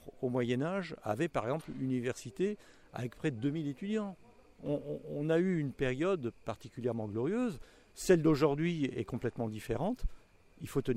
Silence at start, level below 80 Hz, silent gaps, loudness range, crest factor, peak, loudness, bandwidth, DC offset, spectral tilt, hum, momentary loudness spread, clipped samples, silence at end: 0 s; -52 dBFS; none; 5 LU; 20 dB; -14 dBFS; -35 LUFS; 16 kHz; under 0.1%; -7 dB/octave; none; 13 LU; under 0.1%; 0 s